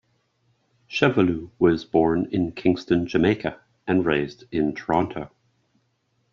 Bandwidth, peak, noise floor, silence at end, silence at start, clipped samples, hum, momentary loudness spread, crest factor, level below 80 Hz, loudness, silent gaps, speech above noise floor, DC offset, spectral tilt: 7.2 kHz; -4 dBFS; -70 dBFS; 1.05 s; 0.9 s; under 0.1%; none; 10 LU; 20 dB; -54 dBFS; -23 LUFS; none; 48 dB; under 0.1%; -5.5 dB/octave